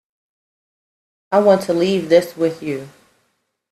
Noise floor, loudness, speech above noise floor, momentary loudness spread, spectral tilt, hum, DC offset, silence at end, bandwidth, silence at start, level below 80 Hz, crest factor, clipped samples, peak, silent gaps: -69 dBFS; -17 LUFS; 53 dB; 13 LU; -6 dB/octave; none; under 0.1%; 0.85 s; 14.5 kHz; 1.3 s; -64 dBFS; 20 dB; under 0.1%; 0 dBFS; none